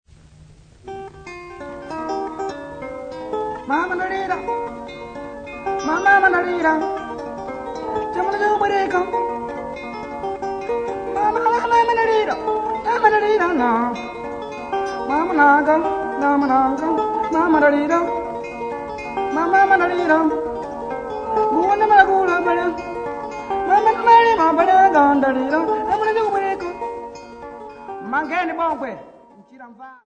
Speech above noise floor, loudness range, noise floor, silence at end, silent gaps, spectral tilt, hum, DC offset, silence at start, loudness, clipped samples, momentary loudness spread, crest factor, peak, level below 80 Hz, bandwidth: 30 dB; 10 LU; -46 dBFS; 0.1 s; none; -5 dB/octave; none; under 0.1%; 0.85 s; -19 LUFS; under 0.1%; 18 LU; 20 dB; 0 dBFS; -50 dBFS; 9.2 kHz